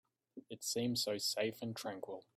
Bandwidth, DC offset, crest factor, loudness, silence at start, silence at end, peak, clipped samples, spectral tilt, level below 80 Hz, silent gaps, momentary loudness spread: 16 kHz; under 0.1%; 16 dB; -39 LUFS; 0.35 s; 0.15 s; -26 dBFS; under 0.1%; -3 dB/octave; -80 dBFS; none; 18 LU